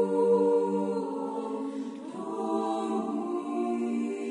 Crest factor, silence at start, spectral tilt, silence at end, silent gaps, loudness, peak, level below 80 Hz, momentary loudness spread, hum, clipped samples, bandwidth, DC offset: 14 dB; 0 s; -7 dB/octave; 0 s; none; -30 LUFS; -14 dBFS; -84 dBFS; 12 LU; none; under 0.1%; 10.5 kHz; under 0.1%